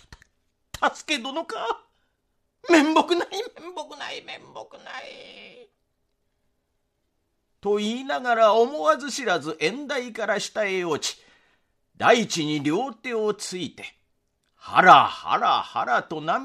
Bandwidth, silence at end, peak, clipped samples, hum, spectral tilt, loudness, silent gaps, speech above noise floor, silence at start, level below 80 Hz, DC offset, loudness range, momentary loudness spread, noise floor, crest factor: 13.5 kHz; 0 s; 0 dBFS; under 0.1%; none; -3.5 dB/octave; -22 LUFS; none; 51 dB; 0.1 s; -66 dBFS; under 0.1%; 17 LU; 21 LU; -74 dBFS; 24 dB